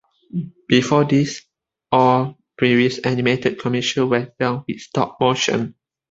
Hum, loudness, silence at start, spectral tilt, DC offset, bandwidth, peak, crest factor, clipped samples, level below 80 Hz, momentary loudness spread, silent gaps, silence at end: none; -19 LUFS; 0.35 s; -5.5 dB/octave; under 0.1%; 7.8 kHz; -2 dBFS; 18 dB; under 0.1%; -56 dBFS; 13 LU; none; 0.4 s